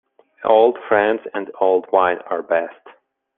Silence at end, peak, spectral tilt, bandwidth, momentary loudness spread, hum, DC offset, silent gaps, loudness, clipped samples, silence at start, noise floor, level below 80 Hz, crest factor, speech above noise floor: 0.45 s; -2 dBFS; -8 dB/octave; 4 kHz; 11 LU; none; under 0.1%; none; -18 LUFS; under 0.1%; 0.4 s; -50 dBFS; -66 dBFS; 18 dB; 33 dB